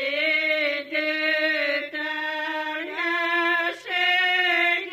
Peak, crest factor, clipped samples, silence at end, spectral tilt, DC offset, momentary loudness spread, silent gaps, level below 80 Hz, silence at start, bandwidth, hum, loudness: -10 dBFS; 14 dB; under 0.1%; 0 s; -1.5 dB/octave; under 0.1%; 8 LU; none; -78 dBFS; 0 s; 15 kHz; 50 Hz at -75 dBFS; -22 LUFS